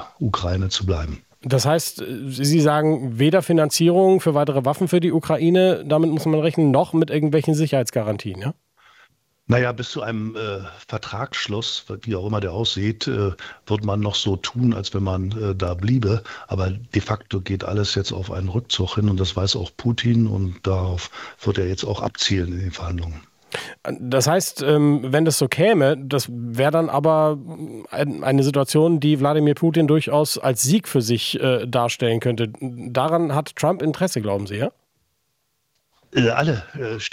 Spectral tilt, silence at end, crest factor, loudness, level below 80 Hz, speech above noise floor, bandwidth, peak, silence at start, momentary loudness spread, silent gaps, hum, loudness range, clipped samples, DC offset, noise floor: -5.5 dB/octave; 0.05 s; 18 dB; -21 LUFS; -48 dBFS; 51 dB; 16.5 kHz; -2 dBFS; 0 s; 11 LU; none; none; 7 LU; under 0.1%; under 0.1%; -71 dBFS